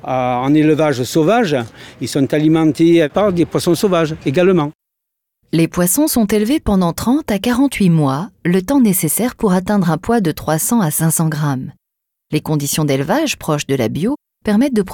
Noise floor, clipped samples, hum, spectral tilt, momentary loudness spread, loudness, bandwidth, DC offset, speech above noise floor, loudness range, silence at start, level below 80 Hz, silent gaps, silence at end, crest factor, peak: -78 dBFS; under 0.1%; none; -5.5 dB/octave; 7 LU; -15 LUFS; 19 kHz; under 0.1%; 63 dB; 3 LU; 0.05 s; -42 dBFS; 4.75-4.79 s; 0 s; 14 dB; -2 dBFS